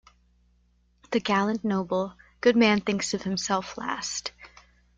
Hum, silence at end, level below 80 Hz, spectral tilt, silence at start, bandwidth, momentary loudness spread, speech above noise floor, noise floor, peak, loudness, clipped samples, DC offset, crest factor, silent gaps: 60 Hz at -50 dBFS; 0.5 s; -60 dBFS; -4 dB/octave; 1.1 s; 9.4 kHz; 11 LU; 40 dB; -65 dBFS; -8 dBFS; -26 LUFS; under 0.1%; under 0.1%; 20 dB; none